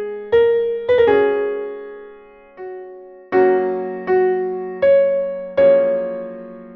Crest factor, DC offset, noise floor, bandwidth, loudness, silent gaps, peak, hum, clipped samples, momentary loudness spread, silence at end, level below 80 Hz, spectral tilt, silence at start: 14 dB; under 0.1%; -43 dBFS; 4.9 kHz; -17 LUFS; none; -4 dBFS; none; under 0.1%; 20 LU; 0 s; -54 dBFS; -8 dB/octave; 0 s